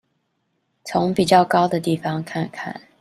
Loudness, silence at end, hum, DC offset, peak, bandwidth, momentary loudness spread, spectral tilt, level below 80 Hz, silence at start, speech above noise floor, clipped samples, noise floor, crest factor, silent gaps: -20 LUFS; 0.2 s; none; under 0.1%; -2 dBFS; 14 kHz; 16 LU; -6 dB/octave; -58 dBFS; 0.85 s; 51 dB; under 0.1%; -71 dBFS; 18 dB; none